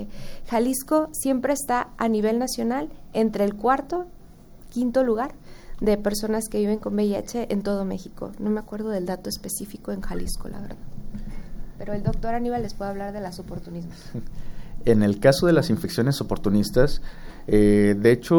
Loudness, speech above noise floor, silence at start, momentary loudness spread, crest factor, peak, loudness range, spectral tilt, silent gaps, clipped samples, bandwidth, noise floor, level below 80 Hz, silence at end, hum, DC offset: -24 LUFS; 22 dB; 0 s; 19 LU; 20 dB; -4 dBFS; 9 LU; -6 dB/octave; none; under 0.1%; over 20 kHz; -45 dBFS; -36 dBFS; 0 s; none; under 0.1%